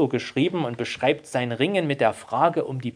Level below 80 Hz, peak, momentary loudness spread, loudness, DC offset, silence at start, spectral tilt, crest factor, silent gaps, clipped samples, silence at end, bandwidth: -66 dBFS; -4 dBFS; 5 LU; -24 LUFS; under 0.1%; 0 s; -6 dB/octave; 18 dB; none; under 0.1%; 0.05 s; 10.5 kHz